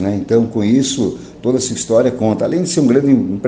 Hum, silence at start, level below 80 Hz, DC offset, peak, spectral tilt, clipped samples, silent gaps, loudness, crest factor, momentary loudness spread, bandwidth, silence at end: none; 0 s; -48 dBFS; under 0.1%; 0 dBFS; -5.5 dB/octave; under 0.1%; none; -15 LUFS; 14 dB; 6 LU; 9.8 kHz; 0 s